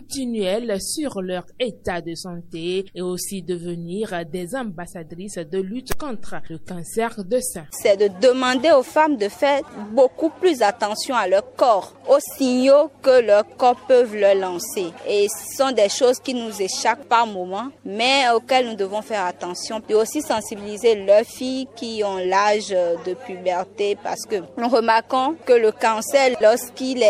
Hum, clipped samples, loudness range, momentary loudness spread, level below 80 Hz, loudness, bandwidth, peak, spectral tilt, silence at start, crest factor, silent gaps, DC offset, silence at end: none; under 0.1%; 10 LU; 13 LU; -54 dBFS; -20 LUFS; 16 kHz; -2 dBFS; -3.5 dB/octave; 0 s; 18 dB; none; under 0.1%; 0 s